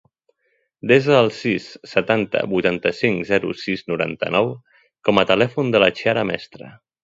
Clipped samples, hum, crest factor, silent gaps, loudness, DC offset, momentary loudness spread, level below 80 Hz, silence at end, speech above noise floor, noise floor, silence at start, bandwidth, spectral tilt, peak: under 0.1%; none; 20 dB; none; -19 LUFS; under 0.1%; 9 LU; -56 dBFS; 0.35 s; 49 dB; -68 dBFS; 0.85 s; 7.8 kHz; -6 dB/octave; 0 dBFS